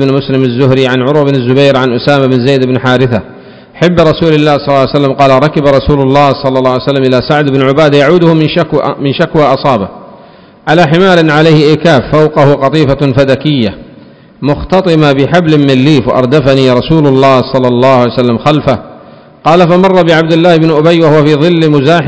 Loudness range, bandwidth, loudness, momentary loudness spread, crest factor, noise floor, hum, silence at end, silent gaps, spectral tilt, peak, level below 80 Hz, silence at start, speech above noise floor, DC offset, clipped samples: 2 LU; 8 kHz; -7 LUFS; 5 LU; 8 dB; -35 dBFS; none; 0 s; none; -7.5 dB/octave; 0 dBFS; -34 dBFS; 0 s; 29 dB; 0.4%; 7%